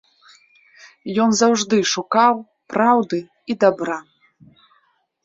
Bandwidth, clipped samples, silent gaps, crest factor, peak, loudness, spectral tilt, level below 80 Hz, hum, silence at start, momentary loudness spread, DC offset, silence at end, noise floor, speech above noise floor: 7.8 kHz; under 0.1%; none; 18 dB; -2 dBFS; -18 LUFS; -3.5 dB/octave; -66 dBFS; none; 1.05 s; 11 LU; under 0.1%; 1.25 s; -63 dBFS; 46 dB